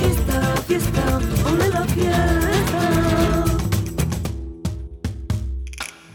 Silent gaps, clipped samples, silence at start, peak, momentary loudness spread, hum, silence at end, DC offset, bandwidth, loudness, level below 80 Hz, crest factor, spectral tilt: none; under 0.1%; 0 s; -6 dBFS; 11 LU; none; 0.15 s; under 0.1%; 19 kHz; -21 LUFS; -28 dBFS; 14 dB; -5.5 dB/octave